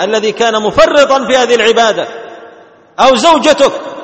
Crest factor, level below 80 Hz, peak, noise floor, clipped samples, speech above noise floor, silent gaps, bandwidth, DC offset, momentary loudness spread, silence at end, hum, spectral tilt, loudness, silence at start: 10 dB; -42 dBFS; 0 dBFS; -39 dBFS; 0.4%; 30 dB; none; 8.8 kHz; under 0.1%; 10 LU; 0 s; none; -2.5 dB/octave; -9 LUFS; 0 s